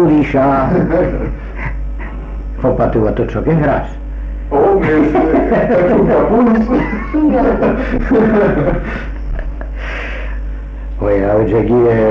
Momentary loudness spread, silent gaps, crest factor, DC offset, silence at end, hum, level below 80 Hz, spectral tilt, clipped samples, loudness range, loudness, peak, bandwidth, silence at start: 14 LU; none; 10 dB; under 0.1%; 0 s; none; -22 dBFS; -9.5 dB/octave; under 0.1%; 5 LU; -13 LUFS; -2 dBFS; 6.6 kHz; 0 s